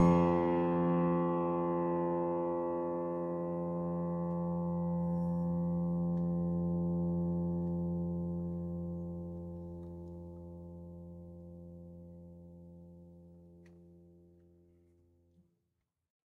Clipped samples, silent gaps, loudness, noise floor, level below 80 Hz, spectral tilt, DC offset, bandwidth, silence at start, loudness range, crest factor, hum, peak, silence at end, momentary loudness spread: under 0.1%; none; -35 LUFS; -85 dBFS; -60 dBFS; -10.5 dB/octave; under 0.1%; 3.5 kHz; 0 s; 19 LU; 20 dB; none; -16 dBFS; 2.2 s; 20 LU